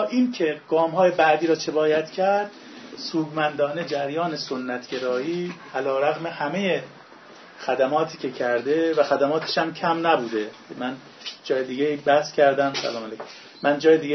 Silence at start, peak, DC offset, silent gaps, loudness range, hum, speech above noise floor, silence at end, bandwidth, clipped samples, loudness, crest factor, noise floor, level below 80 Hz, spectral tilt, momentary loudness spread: 0 s; -6 dBFS; under 0.1%; none; 4 LU; none; 23 dB; 0 s; 6.4 kHz; under 0.1%; -23 LUFS; 18 dB; -46 dBFS; -74 dBFS; -5 dB/octave; 13 LU